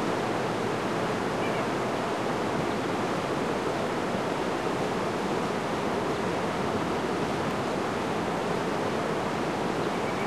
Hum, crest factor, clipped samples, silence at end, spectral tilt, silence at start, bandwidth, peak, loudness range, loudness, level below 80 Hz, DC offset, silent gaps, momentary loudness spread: none; 14 dB; under 0.1%; 0 s; -5.5 dB/octave; 0 s; 13 kHz; -16 dBFS; 0 LU; -29 LUFS; -54 dBFS; 0.2%; none; 1 LU